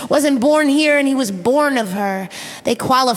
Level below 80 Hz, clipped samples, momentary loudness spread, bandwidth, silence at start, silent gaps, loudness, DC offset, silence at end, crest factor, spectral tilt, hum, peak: -58 dBFS; under 0.1%; 9 LU; 16 kHz; 0 s; none; -16 LUFS; under 0.1%; 0 s; 14 dB; -4 dB/octave; none; -2 dBFS